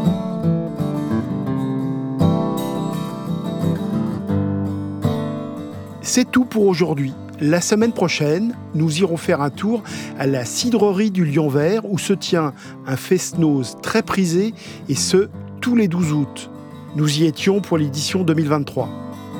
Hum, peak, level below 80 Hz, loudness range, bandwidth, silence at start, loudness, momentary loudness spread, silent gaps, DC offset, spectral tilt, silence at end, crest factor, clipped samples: none; -2 dBFS; -56 dBFS; 3 LU; 19 kHz; 0 s; -20 LUFS; 9 LU; none; under 0.1%; -5.5 dB/octave; 0 s; 18 dB; under 0.1%